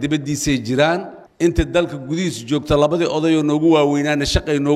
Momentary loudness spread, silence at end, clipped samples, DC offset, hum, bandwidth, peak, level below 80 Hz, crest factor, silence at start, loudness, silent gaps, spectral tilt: 8 LU; 0 s; under 0.1%; under 0.1%; none; 13.5 kHz; -2 dBFS; -32 dBFS; 14 dB; 0 s; -18 LUFS; none; -5.5 dB/octave